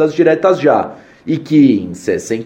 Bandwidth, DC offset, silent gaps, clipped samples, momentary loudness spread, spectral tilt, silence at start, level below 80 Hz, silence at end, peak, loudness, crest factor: 10.5 kHz; under 0.1%; none; under 0.1%; 11 LU; -6.5 dB/octave; 0 s; -56 dBFS; 0 s; 0 dBFS; -13 LUFS; 12 dB